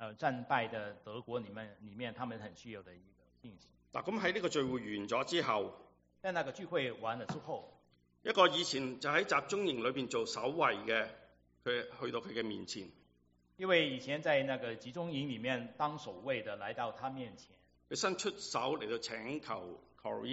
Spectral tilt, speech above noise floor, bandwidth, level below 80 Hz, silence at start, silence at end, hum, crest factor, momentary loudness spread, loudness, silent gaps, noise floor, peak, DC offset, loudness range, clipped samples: -2.5 dB/octave; 35 dB; 8 kHz; -74 dBFS; 0 s; 0 s; none; 24 dB; 14 LU; -37 LUFS; none; -72 dBFS; -14 dBFS; under 0.1%; 6 LU; under 0.1%